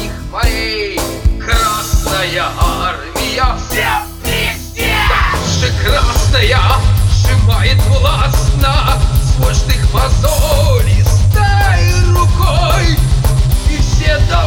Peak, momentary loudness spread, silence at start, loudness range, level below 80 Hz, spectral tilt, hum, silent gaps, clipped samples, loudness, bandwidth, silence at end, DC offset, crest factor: 0 dBFS; 5 LU; 0 s; 3 LU; -14 dBFS; -4.5 dB/octave; none; none; under 0.1%; -13 LUFS; 19 kHz; 0 s; under 0.1%; 10 dB